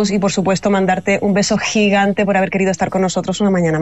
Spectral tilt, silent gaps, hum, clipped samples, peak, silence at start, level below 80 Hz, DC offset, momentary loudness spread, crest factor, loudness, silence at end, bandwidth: -5 dB/octave; none; none; under 0.1%; -4 dBFS; 0 s; -48 dBFS; 0.5%; 3 LU; 12 dB; -15 LUFS; 0 s; 8.2 kHz